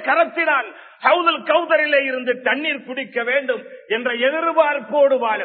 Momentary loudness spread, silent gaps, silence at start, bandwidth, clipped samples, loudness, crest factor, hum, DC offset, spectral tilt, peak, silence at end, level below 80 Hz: 9 LU; none; 0 s; 4.5 kHz; under 0.1%; -18 LUFS; 18 dB; none; under 0.1%; -7.5 dB/octave; -2 dBFS; 0 s; -86 dBFS